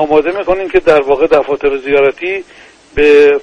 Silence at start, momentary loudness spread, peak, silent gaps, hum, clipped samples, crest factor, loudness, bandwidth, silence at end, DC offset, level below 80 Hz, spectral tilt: 0 s; 11 LU; 0 dBFS; none; none; 0.2%; 10 dB; -11 LUFS; 8.2 kHz; 0 s; under 0.1%; -36 dBFS; -5.5 dB/octave